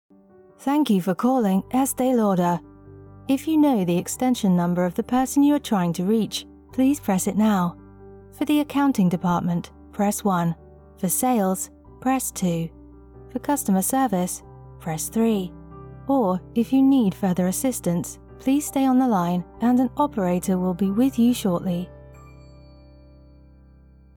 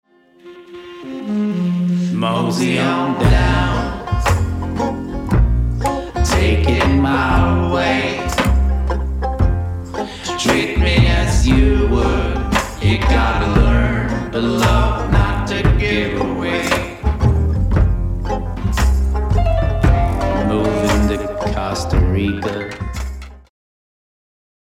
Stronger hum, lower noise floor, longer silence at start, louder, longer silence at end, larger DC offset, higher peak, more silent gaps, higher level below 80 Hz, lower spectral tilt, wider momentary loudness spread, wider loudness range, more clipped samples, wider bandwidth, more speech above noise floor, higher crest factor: neither; first, -52 dBFS vs -42 dBFS; first, 0.6 s vs 0.45 s; second, -22 LUFS vs -17 LUFS; first, 1.9 s vs 1.35 s; neither; second, -10 dBFS vs 0 dBFS; neither; second, -50 dBFS vs -20 dBFS; about the same, -6 dB/octave vs -6 dB/octave; first, 11 LU vs 8 LU; about the same, 4 LU vs 3 LU; neither; first, 19 kHz vs 15 kHz; about the same, 30 dB vs 27 dB; about the same, 12 dB vs 16 dB